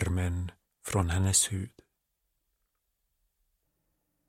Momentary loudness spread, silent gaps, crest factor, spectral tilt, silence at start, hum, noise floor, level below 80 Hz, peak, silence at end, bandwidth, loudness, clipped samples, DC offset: 18 LU; none; 22 dB; -4 dB/octave; 0 s; none; -80 dBFS; -48 dBFS; -12 dBFS; 2.6 s; 16.5 kHz; -29 LUFS; under 0.1%; under 0.1%